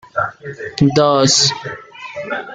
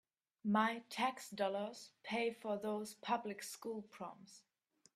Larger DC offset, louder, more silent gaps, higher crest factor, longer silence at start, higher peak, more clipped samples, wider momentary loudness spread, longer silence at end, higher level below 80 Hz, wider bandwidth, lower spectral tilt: neither; first, -14 LUFS vs -41 LUFS; neither; second, 16 dB vs 22 dB; second, 0.15 s vs 0.45 s; first, -2 dBFS vs -20 dBFS; neither; first, 19 LU vs 16 LU; second, 0 s vs 0.55 s; first, -50 dBFS vs -88 dBFS; second, 9.6 kHz vs 14.5 kHz; about the same, -3.5 dB/octave vs -4.5 dB/octave